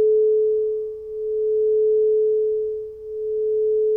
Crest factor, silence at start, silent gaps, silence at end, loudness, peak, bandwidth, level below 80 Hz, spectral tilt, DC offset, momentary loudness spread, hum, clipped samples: 8 dB; 0 s; none; 0 s; -21 LUFS; -12 dBFS; 0.9 kHz; -58 dBFS; -9.5 dB/octave; under 0.1%; 11 LU; none; under 0.1%